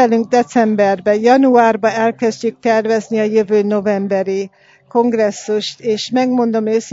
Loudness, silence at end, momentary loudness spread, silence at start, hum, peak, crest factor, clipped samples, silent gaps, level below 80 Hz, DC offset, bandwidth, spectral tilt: -15 LUFS; 0 s; 8 LU; 0 s; none; 0 dBFS; 14 dB; under 0.1%; none; -64 dBFS; under 0.1%; 7.8 kHz; -5.5 dB/octave